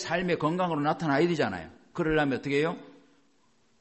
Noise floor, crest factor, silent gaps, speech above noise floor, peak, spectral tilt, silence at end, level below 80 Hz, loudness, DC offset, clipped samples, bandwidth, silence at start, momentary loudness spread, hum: -68 dBFS; 16 dB; none; 41 dB; -14 dBFS; -6 dB/octave; 0.9 s; -56 dBFS; -28 LUFS; under 0.1%; under 0.1%; 8.4 kHz; 0 s; 9 LU; none